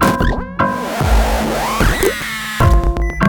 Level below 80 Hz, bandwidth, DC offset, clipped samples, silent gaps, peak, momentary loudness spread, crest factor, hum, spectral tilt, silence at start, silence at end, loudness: -18 dBFS; 19.5 kHz; under 0.1%; under 0.1%; none; 0 dBFS; 5 LU; 14 dB; none; -5.5 dB/octave; 0 s; 0 s; -16 LUFS